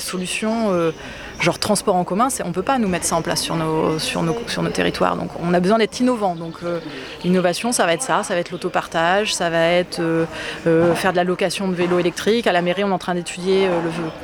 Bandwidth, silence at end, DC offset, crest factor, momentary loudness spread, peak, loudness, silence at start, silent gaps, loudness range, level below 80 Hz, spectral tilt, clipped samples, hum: 19 kHz; 0 s; under 0.1%; 18 dB; 7 LU; -2 dBFS; -20 LUFS; 0 s; none; 2 LU; -48 dBFS; -4.5 dB/octave; under 0.1%; none